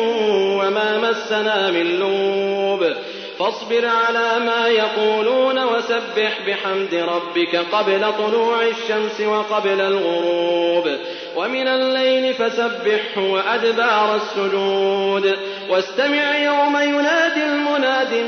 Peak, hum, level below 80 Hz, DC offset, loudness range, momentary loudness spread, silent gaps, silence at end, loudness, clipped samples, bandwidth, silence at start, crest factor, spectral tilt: -4 dBFS; none; -76 dBFS; under 0.1%; 1 LU; 4 LU; none; 0 s; -18 LUFS; under 0.1%; 6.6 kHz; 0 s; 14 dB; -4 dB/octave